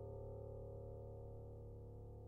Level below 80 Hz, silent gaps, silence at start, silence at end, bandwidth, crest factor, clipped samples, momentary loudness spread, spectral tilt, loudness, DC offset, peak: -60 dBFS; none; 0 s; 0 s; 1.6 kHz; 12 dB; under 0.1%; 4 LU; -12 dB/octave; -54 LUFS; under 0.1%; -40 dBFS